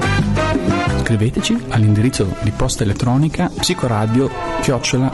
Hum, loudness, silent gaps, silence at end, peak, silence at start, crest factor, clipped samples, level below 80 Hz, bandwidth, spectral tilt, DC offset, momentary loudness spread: none; -17 LUFS; none; 0 s; -6 dBFS; 0 s; 10 dB; under 0.1%; -30 dBFS; 12 kHz; -5.5 dB/octave; under 0.1%; 4 LU